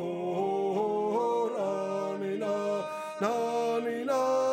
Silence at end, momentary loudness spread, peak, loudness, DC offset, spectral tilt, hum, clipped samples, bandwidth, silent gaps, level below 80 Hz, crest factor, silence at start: 0 s; 4 LU; -16 dBFS; -30 LUFS; under 0.1%; -5.5 dB/octave; none; under 0.1%; 16 kHz; none; -86 dBFS; 14 dB; 0 s